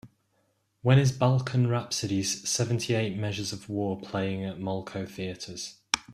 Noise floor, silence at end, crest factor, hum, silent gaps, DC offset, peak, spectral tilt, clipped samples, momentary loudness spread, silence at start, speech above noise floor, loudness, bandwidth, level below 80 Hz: -72 dBFS; 0 s; 26 dB; none; none; under 0.1%; -2 dBFS; -5 dB/octave; under 0.1%; 13 LU; 0.05 s; 44 dB; -28 LUFS; 14.5 kHz; -60 dBFS